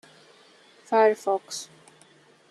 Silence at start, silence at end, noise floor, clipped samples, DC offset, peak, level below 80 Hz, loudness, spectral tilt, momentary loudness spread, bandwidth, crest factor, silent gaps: 0.9 s; 0.85 s; -57 dBFS; under 0.1%; under 0.1%; -8 dBFS; -84 dBFS; -24 LUFS; -3 dB/octave; 15 LU; 12.5 kHz; 20 dB; none